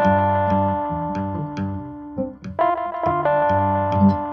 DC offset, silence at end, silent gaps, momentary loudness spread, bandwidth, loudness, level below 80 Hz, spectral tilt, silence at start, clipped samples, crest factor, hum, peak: under 0.1%; 0 s; none; 12 LU; 6.4 kHz; -21 LUFS; -48 dBFS; -9.5 dB/octave; 0 s; under 0.1%; 16 dB; none; -6 dBFS